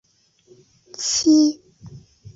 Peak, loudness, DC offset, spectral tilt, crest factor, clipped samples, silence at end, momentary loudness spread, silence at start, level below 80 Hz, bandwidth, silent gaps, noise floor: -6 dBFS; -18 LUFS; under 0.1%; -3 dB/octave; 16 dB; under 0.1%; 0.4 s; 23 LU; 1 s; -60 dBFS; 7.8 kHz; none; -56 dBFS